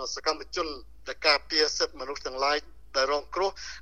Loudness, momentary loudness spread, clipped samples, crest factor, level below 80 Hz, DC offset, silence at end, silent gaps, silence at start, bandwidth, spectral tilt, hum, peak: -27 LUFS; 12 LU; under 0.1%; 22 dB; -52 dBFS; 0.4%; 0 s; none; 0 s; 10 kHz; -1 dB/octave; none; -8 dBFS